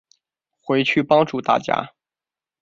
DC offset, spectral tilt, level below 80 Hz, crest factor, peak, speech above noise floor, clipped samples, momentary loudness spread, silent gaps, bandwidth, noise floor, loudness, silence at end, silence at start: under 0.1%; -6 dB/octave; -64 dBFS; 20 dB; -2 dBFS; over 71 dB; under 0.1%; 15 LU; none; 7.6 kHz; under -90 dBFS; -19 LUFS; 0.75 s; 0.65 s